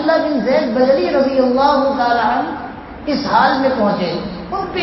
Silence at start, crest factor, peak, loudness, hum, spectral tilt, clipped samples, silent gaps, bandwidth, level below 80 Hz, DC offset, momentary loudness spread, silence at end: 0 s; 14 dB; 0 dBFS; -15 LUFS; none; -7 dB/octave; under 0.1%; none; 6 kHz; -44 dBFS; under 0.1%; 11 LU; 0 s